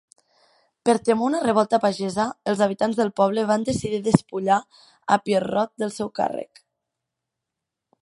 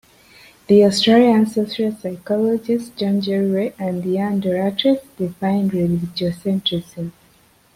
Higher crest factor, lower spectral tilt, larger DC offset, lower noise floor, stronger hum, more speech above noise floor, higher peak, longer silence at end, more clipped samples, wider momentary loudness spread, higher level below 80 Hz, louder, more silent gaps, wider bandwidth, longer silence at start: first, 24 dB vs 16 dB; about the same, -5.5 dB/octave vs -6.5 dB/octave; neither; first, -84 dBFS vs -54 dBFS; neither; first, 62 dB vs 36 dB; about the same, 0 dBFS vs -2 dBFS; first, 1.6 s vs 0.65 s; neither; second, 7 LU vs 11 LU; about the same, -58 dBFS vs -56 dBFS; second, -22 LUFS vs -18 LUFS; neither; second, 11.5 kHz vs 15.5 kHz; first, 0.85 s vs 0.7 s